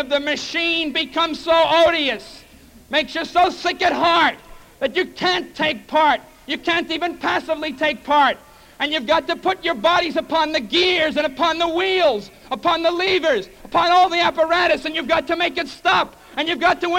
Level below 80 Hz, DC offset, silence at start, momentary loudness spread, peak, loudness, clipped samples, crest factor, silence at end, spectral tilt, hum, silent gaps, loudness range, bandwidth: -50 dBFS; under 0.1%; 0 s; 7 LU; -6 dBFS; -19 LUFS; under 0.1%; 12 dB; 0 s; -3 dB/octave; none; none; 2 LU; 16.5 kHz